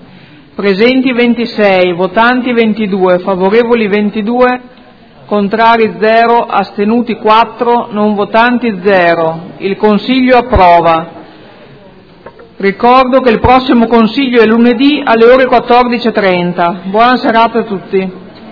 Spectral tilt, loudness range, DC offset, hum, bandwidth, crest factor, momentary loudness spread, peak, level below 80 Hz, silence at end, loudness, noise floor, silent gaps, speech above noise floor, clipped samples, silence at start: -8 dB/octave; 3 LU; under 0.1%; none; 5.4 kHz; 8 dB; 8 LU; 0 dBFS; -34 dBFS; 0 s; -9 LUFS; -37 dBFS; none; 29 dB; 2%; 0.6 s